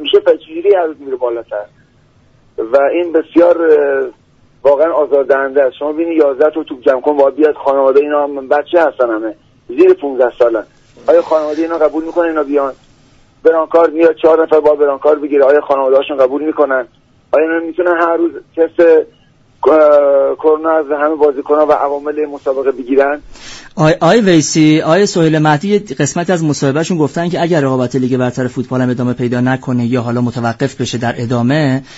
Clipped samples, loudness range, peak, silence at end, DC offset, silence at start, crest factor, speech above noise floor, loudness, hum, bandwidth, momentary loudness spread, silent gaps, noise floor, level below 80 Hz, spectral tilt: under 0.1%; 3 LU; 0 dBFS; 0 s; under 0.1%; 0 s; 12 dB; 37 dB; -12 LUFS; none; 8 kHz; 8 LU; none; -49 dBFS; -50 dBFS; -6 dB/octave